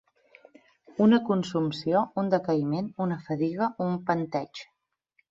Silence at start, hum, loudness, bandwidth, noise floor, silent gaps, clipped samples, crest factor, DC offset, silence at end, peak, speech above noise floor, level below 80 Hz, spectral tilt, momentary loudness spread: 0.9 s; none; -27 LUFS; 7.6 kHz; -71 dBFS; none; under 0.1%; 18 dB; under 0.1%; 0.65 s; -10 dBFS; 45 dB; -70 dBFS; -7.5 dB/octave; 10 LU